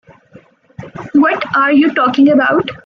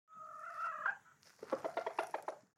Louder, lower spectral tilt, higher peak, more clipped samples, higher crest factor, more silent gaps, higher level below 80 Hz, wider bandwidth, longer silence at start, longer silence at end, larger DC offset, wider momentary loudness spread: first, -11 LUFS vs -43 LUFS; first, -7 dB/octave vs -3 dB/octave; first, -2 dBFS vs -24 dBFS; neither; second, 12 dB vs 20 dB; neither; first, -56 dBFS vs under -90 dBFS; second, 6.2 kHz vs 16.5 kHz; first, 0.8 s vs 0.1 s; about the same, 0.1 s vs 0.15 s; neither; second, 9 LU vs 13 LU